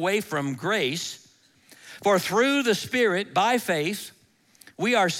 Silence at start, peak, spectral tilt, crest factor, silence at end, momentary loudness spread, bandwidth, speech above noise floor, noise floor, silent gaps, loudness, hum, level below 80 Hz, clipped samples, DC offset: 0 s; -10 dBFS; -4 dB/octave; 16 dB; 0 s; 13 LU; 17 kHz; 34 dB; -58 dBFS; none; -24 LUFS; none; -70 dBFS; under 0.1%; under 0.1%